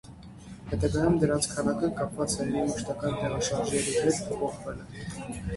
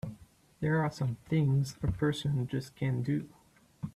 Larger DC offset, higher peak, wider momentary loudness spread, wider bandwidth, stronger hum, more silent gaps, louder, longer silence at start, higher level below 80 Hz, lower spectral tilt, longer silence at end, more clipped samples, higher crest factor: neither; first, -12 dBFS vs -18 dBFS; first, 14 LU vs 7 LU; about the same, 12 kHz vs 13 kHz; neither; neither; first, -29 LUFS vs -32 LUFS; about the same, 0.05 s vs 0.05 s; first, -46 dBFS vs -54 dBFS; second, -5 dB/octave vs -7 dB/octave; about the same, 0 s vs 0.05 s; neither; about the same, 18 dB vs 14 dB